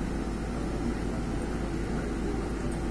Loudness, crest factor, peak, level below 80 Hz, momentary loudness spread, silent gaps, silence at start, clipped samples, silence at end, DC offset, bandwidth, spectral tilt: -33 LUFS; 12 dB; -18 dBFS; -36 dBFS; 1 LU; none; 0 s; under 0.1%; 0 s; 0.3%; 11 kHz; -6.5 dB/octave